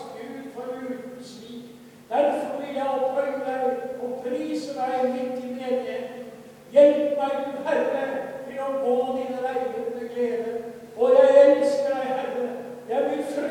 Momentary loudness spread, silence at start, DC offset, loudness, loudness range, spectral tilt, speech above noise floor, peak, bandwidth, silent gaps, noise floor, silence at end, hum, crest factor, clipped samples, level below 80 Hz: 19 LU; 0 s; under 0.1%; -24 LUFS; 7 LU; -5 dB/octave; 20 dB; -4 dBFS; 12.5 kHz; none; -45 dBFS; 0 s; none; 20 dB; under 0.1%; -70 dBFS